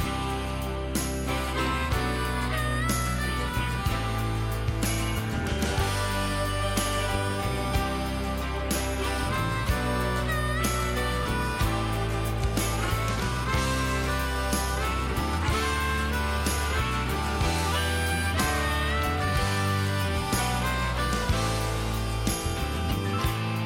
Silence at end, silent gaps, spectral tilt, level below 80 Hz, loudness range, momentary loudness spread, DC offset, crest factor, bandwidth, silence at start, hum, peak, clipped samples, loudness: 0 s; none; -4.5 dB/octave; -34 dBFS; 2 LU; 3 LU; under 0.1%; 12 dB; 17 kHz; 0 s; none; -14 dBFS; under 0.1%; -27 LUFS